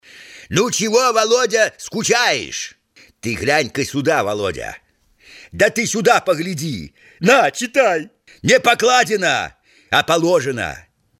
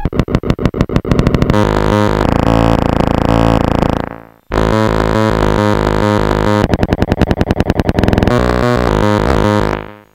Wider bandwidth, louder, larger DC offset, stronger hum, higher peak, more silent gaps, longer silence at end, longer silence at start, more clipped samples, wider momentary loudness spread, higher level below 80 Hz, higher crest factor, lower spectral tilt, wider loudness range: about the same, 16.5 kHz vs 16.5 kHz; second, -17 LUFS vs -13 LUFS; neither; neither; about the same, 0 dBFS vs 0 dBFS; neither; first, 0.4 s vs 0.15 s; first, 0.15 s vs 0 s; second, under 0.1% vs 0.8%; first, 14 LU vs 4 LU; second, -52 dBFS vs -22 dBFS; first, 18 dB vs 12 dB; second, -3 dB/octave vs -7 dB/octave; first, 4 LU vs 1 LU